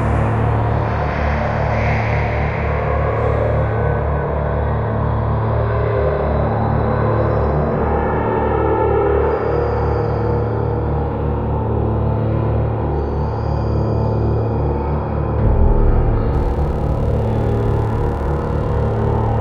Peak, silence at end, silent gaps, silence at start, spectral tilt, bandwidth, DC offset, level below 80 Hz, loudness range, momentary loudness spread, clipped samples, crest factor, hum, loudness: -2 dBFS; 0 s; none; 0 s; -10 dB/octave; 5.6 kHz; under 0.1%; -22 dBFS; 2 LU; 3 LU; under 0.1%; 14 dB; none; -18 LUFS